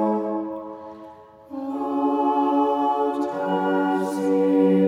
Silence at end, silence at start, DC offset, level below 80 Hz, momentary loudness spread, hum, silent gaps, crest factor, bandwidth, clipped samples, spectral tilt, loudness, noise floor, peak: 0 s; 0 s; under 0.1%; -68 dBFS; 17 LU; none; none; 14 dB; 11.5 kHz; under 0.1%; -7.5 dB/octave; -22 LUFS; -44 dBFS; -8 dBFS